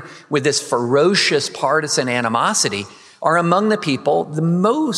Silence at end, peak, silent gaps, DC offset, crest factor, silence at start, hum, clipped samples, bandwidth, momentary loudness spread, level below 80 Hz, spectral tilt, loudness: 0 s; 0 dBFS; none; under 0.1%; 16 dB; 0 s; none; under 0.1%; 13.5 kHz; 5 LU; -70 dBFS; -4 dB/octave; -17 LUFS